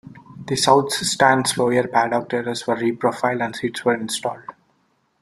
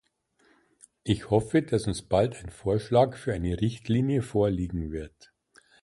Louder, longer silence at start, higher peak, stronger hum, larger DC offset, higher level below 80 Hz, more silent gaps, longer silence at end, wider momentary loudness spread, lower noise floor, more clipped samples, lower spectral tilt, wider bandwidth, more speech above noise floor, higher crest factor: first, -20 LUFS vs -27 LUFS; second, 0.05 s vs 1.05 s; first, -2 dBFS vs -8 dBFS; neither; neither; second, -60 dBFS vs -46 dBFS; neither; about the same, 0.7 s vs 0.75 s; about the same, 10 LU vs 10 LU; about the same, -65 dBFS vs -67 dBFS; neither; second, -3.5 dB/octave vs -7 dB/octave; first, 14 kHz vs 11.5 kHz; first, 45 dB vs 40 dB; about the same, 20 dB vs 18 dB